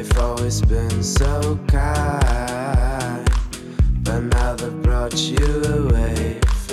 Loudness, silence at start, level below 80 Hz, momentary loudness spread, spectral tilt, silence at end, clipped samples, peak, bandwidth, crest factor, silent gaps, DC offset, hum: -20 LUFS; 0 s; -20 dBFS; 3 LU; -5.5 dB/octave; 0 s; under 0.1%; -6 dBFS; 13.5 kHz; 12 dB; none; under 0.1%; none